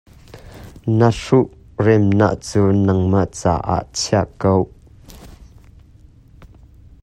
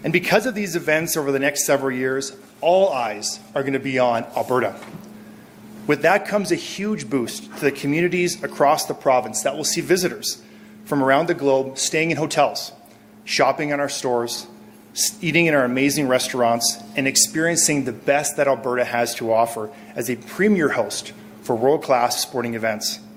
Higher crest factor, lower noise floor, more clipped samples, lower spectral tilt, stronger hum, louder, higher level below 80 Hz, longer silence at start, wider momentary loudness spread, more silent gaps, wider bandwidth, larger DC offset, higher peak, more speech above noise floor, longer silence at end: about the same, 18 dB vs 20 dB; about the same, -46 dBFS vs -47 dBFS; neither; first, -6.5 dB/octave vs -3.5 dB/octave; neither; first, -17 LUFS vs -20 LUFS; first, -42 dBFS vs -62 dBFS; first, 0.35 s vs 0 s; about the same, 7 LU vs 9 LU; neither; second, 11.5 kHz vs 16.5 kHz; neither; about the same, 0 dBFS vs 0 dBFS; first, 30 dB vs 26 dB; first, 0.55 s vs 0 s